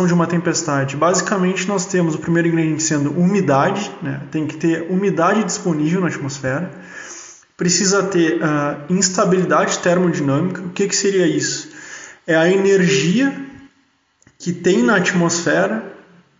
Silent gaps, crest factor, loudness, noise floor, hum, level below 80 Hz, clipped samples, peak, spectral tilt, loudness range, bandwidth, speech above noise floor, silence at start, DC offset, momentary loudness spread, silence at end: none; 16 dB; -17 LUFS; -60 dBFS; none; -60 dBFS; under 0.1%; 0 dBFS; -5 dB/octave; 2 LU; 7.8 kHz; 43 dB; 0 s; under 0.1%; 12 LU; 0.45 s